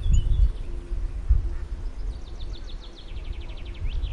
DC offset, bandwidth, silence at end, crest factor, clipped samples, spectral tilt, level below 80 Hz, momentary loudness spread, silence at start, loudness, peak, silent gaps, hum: under 0.1%; 7.4 kHz; 0 s; 16 dB; under 0.1%; -6 dB/octave; -26 dBFS; 14 LU; 0 s; -31 LUFS; -8 dBFS; none; none